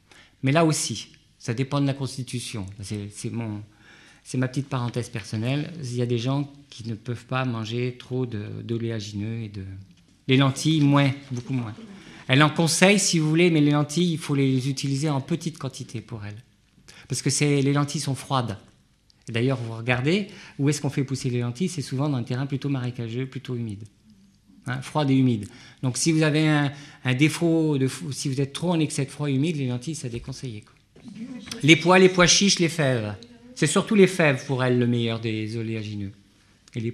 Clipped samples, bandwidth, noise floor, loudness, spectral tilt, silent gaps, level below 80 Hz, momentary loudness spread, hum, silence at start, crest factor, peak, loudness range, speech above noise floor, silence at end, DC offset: under 0.1%; 14 kHz; -60 dBFS; -24 LUFS; -5 dB/octave; none; -58 dBFS; 17 LU; none; 0.45 s; 24 dB; 0 dBFS; 9 LU; 37 dB; 0 s; under 0.1%